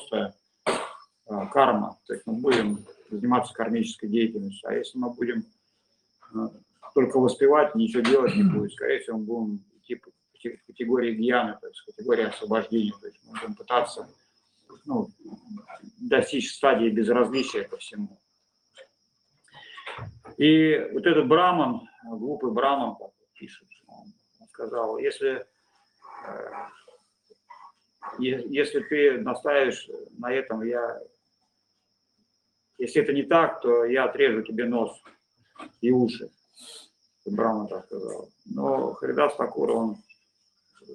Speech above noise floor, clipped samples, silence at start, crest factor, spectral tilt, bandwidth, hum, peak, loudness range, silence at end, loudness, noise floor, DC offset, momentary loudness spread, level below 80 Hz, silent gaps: 49 dB; under 0.1%; 0 s; 22 dB; -5.5 dB/octave; 11 kHz; none; -4 dBFS; 10 LU; 0 s; -25 LUFS; -74 dBFS; under 0.1%; 20 LU; -70 dBFS; none